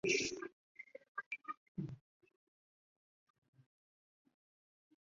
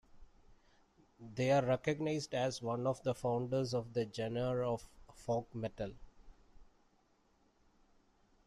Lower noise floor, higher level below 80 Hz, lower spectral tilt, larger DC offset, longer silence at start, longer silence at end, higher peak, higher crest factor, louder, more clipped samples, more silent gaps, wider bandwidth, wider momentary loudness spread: first, under -90 dBFS vs -73 dBFS; second, -78 dBFS vs -64 dBFS; second, -3 dB/octave vs -6 dB/octave; neither; about the same, 0.05 s vs 0.15 s; first, 3.1 s vs 1.85 s; about the same, -22 dBFS vs -20 dBFS; first, 26 dB vs 20 dB; second, -44 LUFS vs -37 LUFS; neither; first, 0.53-0.75 s, 1.08-1.15 s, 1.26-1.31 s, 1.57-1.75 s vs none; second, 7.4 kHz vs 13 kHz; first, 20 LU vs 12 LU